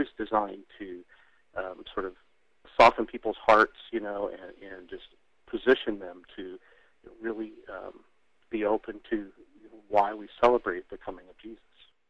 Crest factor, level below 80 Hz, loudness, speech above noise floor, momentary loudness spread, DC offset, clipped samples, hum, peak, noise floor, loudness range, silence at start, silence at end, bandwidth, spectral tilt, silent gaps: 24 dB; -56 dBFS; -28 LUFS; 32 dB; 24 LU; under 0.1%; under 0.1%; none; -6 dBFS; -61 dBFS; 9 LU; 0 s; 0.55 s; 9.8 kHz; -5 dB/octave; none